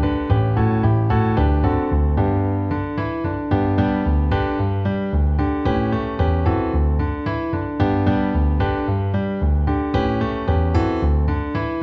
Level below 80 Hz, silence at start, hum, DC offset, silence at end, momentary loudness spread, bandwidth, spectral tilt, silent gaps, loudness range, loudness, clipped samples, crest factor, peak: -24 dBFS; 0 s; none; under 0.1%; 0 s; 5 LU; 5.2 kHz; -10 dB/octave; none; 1 LU; -20 LUFS; under 0.1%; 14 dB; -6 dBFS